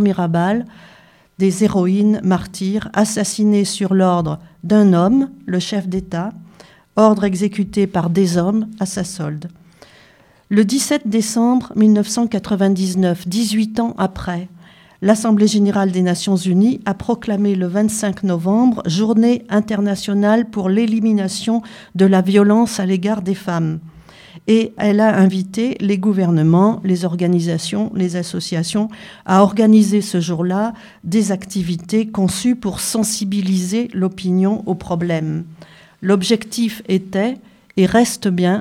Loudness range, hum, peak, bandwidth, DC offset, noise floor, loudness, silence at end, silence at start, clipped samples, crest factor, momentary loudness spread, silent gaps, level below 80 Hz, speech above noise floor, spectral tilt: 3 LU; none; 0 dBFS; 14.5 kHz; under 0.1%; -50 dBFS; -17 LUFS; 0 s; 0 s; under 0.1%; 16 dB; 9 LU; none; -50 dBFS; 34 dB; -6 dB/octave